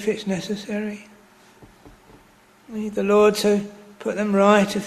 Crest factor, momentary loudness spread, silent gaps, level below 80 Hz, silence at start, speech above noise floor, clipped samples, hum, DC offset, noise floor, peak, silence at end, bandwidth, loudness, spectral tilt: 20 dB; 16 LU; none; -58 dBFS; 0 s; 33 dB; under 0.1%; none; under 0.1%; -53 dBFS; -2 dBFS; 0 s; 13.5 kHz; -21 LUFS; -5.5 dB/octave